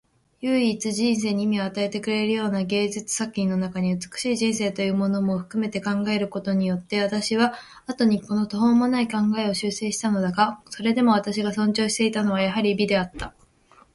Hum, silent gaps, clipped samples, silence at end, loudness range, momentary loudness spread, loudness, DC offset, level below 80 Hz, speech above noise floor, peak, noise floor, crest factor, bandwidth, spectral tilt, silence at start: none; none; under 0.1%; 0.65 s; 2 LU; 6 LU; -23 LUFS; under 0.1%; -56 dBFS; 33 dB; -6 dBFS; -56 dBFS; 16 dB; 11.5 kHz; -5 dB/octave; 0.4 s